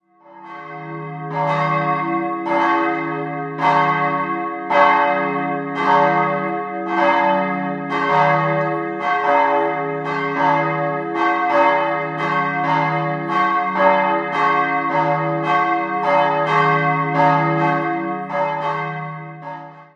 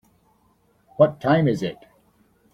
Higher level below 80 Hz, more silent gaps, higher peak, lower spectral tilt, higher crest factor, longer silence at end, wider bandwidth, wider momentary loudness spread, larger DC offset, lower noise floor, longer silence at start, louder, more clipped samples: second, -68 dBFS vs -58 dBFS; neither; about the same, -2 dBFS vs -4 dBFS; about the same, -7 dB/octave vs -8 dB/octave; about the same, 18 dB vs 20 dB; second, 0.1 s vs 0.8 s; second, 8 kHz vs 11 kHz; second, 9 LU vs 13 LU; neither; second, -42 dBFS vs -62 dBFS; second, 0.3 s vs 1 s; first, -18 LUFS vs -21 LUFS; neither